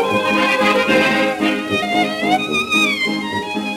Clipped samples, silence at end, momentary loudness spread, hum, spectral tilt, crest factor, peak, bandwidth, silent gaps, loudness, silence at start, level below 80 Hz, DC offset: under 0.1%; 0 s; 5 LU; none; -4 dB/octave; 14 dB; -2 dBFS; 16.5 kHz; none; -16 LUFS; 0 s; -54 dBFS; under 0.1%